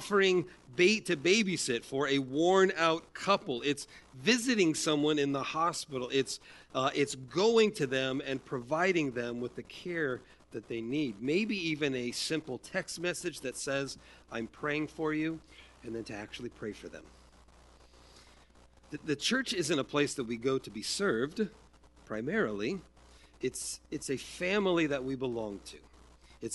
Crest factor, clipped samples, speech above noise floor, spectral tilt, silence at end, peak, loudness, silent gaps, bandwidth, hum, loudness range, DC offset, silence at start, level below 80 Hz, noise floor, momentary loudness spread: 20 dB; under 0.1%; 28 dB; -4 dB/octave; 0 s; -12 dBFS; -32 LUFS; none; 11.5 kHz; none; 9 LU; under 0.1%; 0 s; -64 dBFS; -60 dBFS; 15 LU